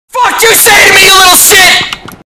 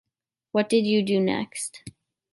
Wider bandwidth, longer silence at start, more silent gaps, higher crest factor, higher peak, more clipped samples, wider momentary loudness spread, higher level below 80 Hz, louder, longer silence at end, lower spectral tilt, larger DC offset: first, over 20 kHz vs 11.5 kHz; second, 0.15 s vs 0.55 s; neither; second, 4 dB vs 16 dB; first, 0 dBFS vs -10 dBFS; first, 9% vs under 0.1%; about the same, 10 LU vs 12 LU; first, -34 dBFS vs -66 dBFS; first, -1 LUFS vs -24 LUFS; second, 0.15 s vs 0.45 s; second, 0.5 dB/octave vs -5 dB/octave; neither